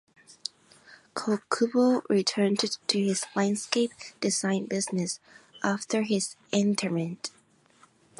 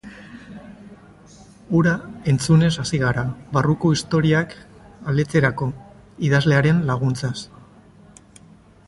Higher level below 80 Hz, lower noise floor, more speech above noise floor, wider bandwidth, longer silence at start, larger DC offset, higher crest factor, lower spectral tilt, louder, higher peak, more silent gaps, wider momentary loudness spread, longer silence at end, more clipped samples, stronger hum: second, -76 dBFS vs -48 dBFS; first, -61 dBFS vs -49 dBFS; first, 34 dB vs 30 dB; about the same, 11.5 kHz vs 11.5 kHz; first, 0.3 s vs 0.05 s; neither; about the same, 22 dB vs 18 dB; second, -4 dB/octave vs -6.5 dB/octave; second, -28 LUFS vs -20 LUFS; second, -8 dBFS vs -4 dBFS; neither; second, 14 LU vs 23 LU; second, 0.9 s vs 1.45 s; neither; neither